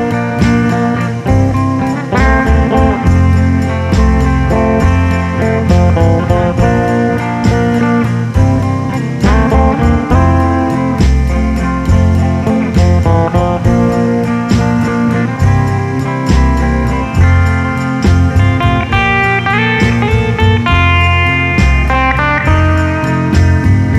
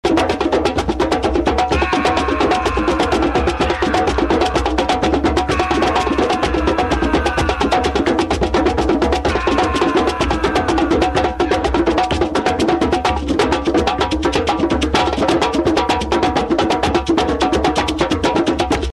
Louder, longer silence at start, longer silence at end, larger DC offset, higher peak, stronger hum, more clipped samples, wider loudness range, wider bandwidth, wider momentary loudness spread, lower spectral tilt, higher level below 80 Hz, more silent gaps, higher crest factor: first, -11 LUFS vs -16 LUFS; about the same, 0 s vs 0.05 s; about the same, 0 s vs 0 s; second, under 0.1% vs 0.2%; about the same, 0 dBFS vs -2 dBFS; neither; neither; about the same, 2 LU vs 0 LU; second, 10 kHz vs 12.5 kHz; about the same, 4 LU vs 2 LU; first, -7 dB/octave vs -5 dB/octave; first, -18 dBFS vs -28 dBFS; neither; about the same, 10 dB vs 14 dB